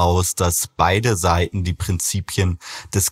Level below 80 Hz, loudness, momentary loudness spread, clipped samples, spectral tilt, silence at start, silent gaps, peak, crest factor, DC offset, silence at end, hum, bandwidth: -36 dBFS; -20 LUFS; 6 LU; under 0.1%; -4 dB/octave; 0 s; none; -2 dBFS; 18 dB; under 0.1%; 0 s; none; 16.5 kHz